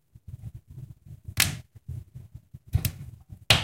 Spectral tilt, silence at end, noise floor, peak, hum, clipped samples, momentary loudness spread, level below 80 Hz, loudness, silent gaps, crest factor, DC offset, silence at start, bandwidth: -2.5 dB/octave; 0 s; -48 dBFS; -2 dBFS; none; under 0.1%; 23 LU; -44 dBFS; -28 LUFS; none; 28 dB; under 0.1%; 0.3 s; 16 kHz